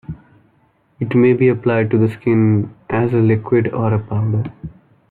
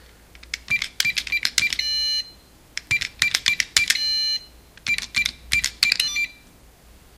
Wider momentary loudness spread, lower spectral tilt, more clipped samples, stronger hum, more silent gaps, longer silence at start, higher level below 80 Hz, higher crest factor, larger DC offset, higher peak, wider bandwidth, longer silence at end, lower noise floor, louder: first, 14 LU vs 10 LU; first, -11 dB/octave vs 1.5 dB/octave; neither; neither; neither; second, 0.1 s vs 0.35 s; about the same, -50 dBFS vs -50 dBFS; second, 14 dB vs 24 dB; neither; about the same, -2 dBFS vs 0 dBFS; second, 4.2 kHz vs 16 kHz; second, 0.4 s vs 0.85 s; first, -58 dBFS vs -50 dBFS; first, -16 LUFS vs -21 LUFS